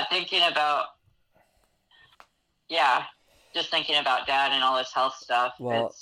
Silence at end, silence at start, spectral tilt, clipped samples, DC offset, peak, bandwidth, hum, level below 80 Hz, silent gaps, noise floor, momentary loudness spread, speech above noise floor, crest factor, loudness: 0 s; 0 s; -2.5 dB/octave; under 0.1%; under 0.1%; -10 dBFS; 15.5 kHz; none; -72 dBFS; none; -68 dBFS; 8 LU; 42 dB; 18 dB; -24 LUFS